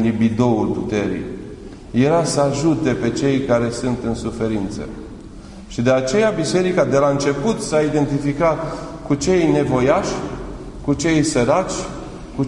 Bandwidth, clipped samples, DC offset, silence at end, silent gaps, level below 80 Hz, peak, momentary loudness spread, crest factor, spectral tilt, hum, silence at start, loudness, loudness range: 11 kHz; under 0.1%; under 0.1%; 0 s; none; -40 dBFS; -2 dBFS; 15 LU; 16 dB; -6 dB/octave; none; 0 s; -18 LUFS; 3 LU